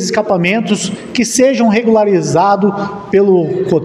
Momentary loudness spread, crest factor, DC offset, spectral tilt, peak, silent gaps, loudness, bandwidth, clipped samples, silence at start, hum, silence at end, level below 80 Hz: 6 LU; 12 dB; under 0.1%; -5 dB/octave; 0 dBFS; none; -12 LUFS; 14.5 kHz; under 0.1%; 0 s; none; 0 s; -52 dBFS